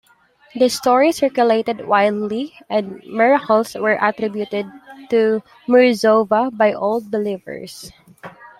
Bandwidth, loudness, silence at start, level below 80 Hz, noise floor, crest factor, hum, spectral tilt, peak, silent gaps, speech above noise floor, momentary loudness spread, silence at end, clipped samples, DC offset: 15.5 kHz; -17 LUFS; 0.55 s; -62 dBFS; -53 dBFS; 16 dB; none; -4.5 dB/octave; -2 dBFS; none; 36 dB; 13 LU; 0.15 s; under 0.1%; under 0.1%